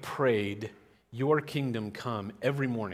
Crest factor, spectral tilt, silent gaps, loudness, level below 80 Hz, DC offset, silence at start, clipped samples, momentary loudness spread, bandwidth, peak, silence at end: 18 dB; -7 dB/octave; none; -31 LUFS; -70 dBFS; under 0.1%; 0 s; under 0.1%; 11 LU; 15.5 kHz; -12 dBFS; 0 s